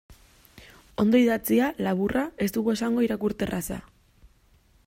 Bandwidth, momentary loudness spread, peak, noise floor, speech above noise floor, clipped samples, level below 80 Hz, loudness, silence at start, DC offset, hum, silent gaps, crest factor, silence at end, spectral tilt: 16 kHz; 11 LU; -10 dBFS; -60 dBFS; 36 dB; under 0.1%; -52 dBFS; -25 LUFS; 0.1 s; under 0.1%; none; none; 16 dB; 1.05 s; -6 dB/octave